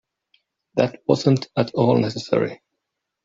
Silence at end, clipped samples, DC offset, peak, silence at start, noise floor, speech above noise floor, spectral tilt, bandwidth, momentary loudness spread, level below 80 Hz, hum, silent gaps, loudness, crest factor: 0.7 s; under 0.1%; under 0.1%; -4 dBFS; 0.75 s; -80 dBFS; 60 dB; -7 dB/octave; 7.6 kHz; 5 LU; -60 dBFS; none; none; -21 LUFS; 20 dB